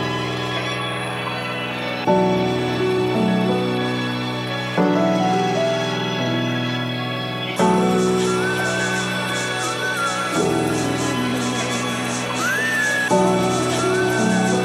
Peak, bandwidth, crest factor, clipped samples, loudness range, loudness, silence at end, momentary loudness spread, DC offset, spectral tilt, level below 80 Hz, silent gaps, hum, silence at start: -4 dBFS; 15.5 kHz; 16 dB; under 0.1%; 1 LU; -20 LUFS; 0 s; 6 LU; under 0.1%; -4.5 dB/octave; -56 dBFS; none; none; 0 s